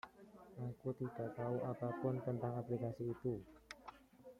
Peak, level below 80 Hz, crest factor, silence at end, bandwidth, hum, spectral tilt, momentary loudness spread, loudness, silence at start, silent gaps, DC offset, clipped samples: -26 dBFS; -72 dBFS; 18 dB; 0.05 s; 13.5 kHz; none; -9 dB/octave; 16 LU; -44 LUFS; 0.05 s; none; under 0.1%; under 0.1%